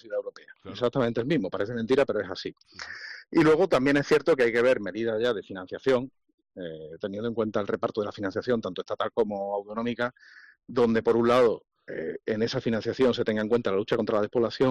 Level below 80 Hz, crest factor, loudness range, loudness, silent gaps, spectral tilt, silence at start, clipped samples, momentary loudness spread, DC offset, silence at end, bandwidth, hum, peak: -60 dBFS; 12 dB; 6 LU; -26 LUFS; 6.34-6.38 s; -6.5 dB/octave; 0.05 s; under 0.1%; 16 LU; under 0.1%; 0 s; 11 kHz; none; -14 dBFS